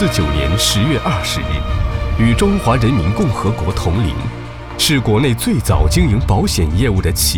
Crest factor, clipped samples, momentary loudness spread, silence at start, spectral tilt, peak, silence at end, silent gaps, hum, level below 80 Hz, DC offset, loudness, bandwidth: 14 dB; under 0.1%; 6 LU; 0 s; -5 dB/octave; 0 dBFS; 0 s; none; none; -22 dBFS; 0.4%; -15 LUFS; 19.5 kHz